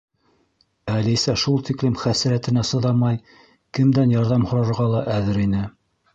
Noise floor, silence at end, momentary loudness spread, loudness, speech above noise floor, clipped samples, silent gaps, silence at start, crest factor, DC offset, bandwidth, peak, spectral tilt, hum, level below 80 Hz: -64 dBFS; 0.45 s; 8 LU; -20 LUFS; 45 dB; under 0.1%; none; 0.85 s; 14 dB; under 0.1%; 8 kHz; -6 dBFS; -6 dB/octave; none; -46 dBFS